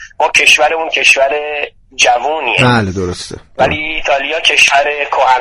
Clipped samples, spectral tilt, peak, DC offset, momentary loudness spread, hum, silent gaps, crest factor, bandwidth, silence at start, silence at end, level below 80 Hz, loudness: 0.3%; -2.5 dB/octave; 0 dBFS; under 0.1%; 12 LU; none; none; 12 dB; over 20 kHz; 0 s; 0 s; -38 dBFS; -10 LUFS